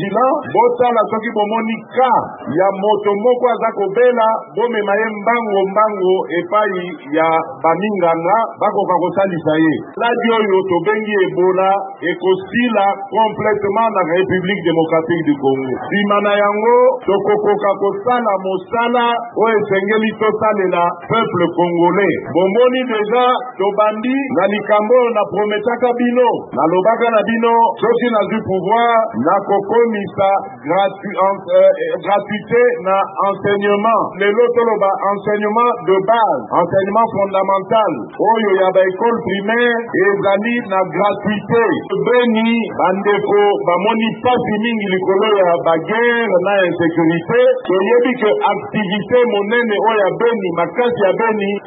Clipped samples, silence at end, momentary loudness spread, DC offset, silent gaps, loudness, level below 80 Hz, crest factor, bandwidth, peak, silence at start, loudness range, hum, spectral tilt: under 0.1%; 0 s; 4 LU; under 0.1%; none; -15 LUFS; -62 dBFS; 14 dB; 4 kHz; 0 dBFS; 0 s; 1 LU; none; -11.5 dB/octave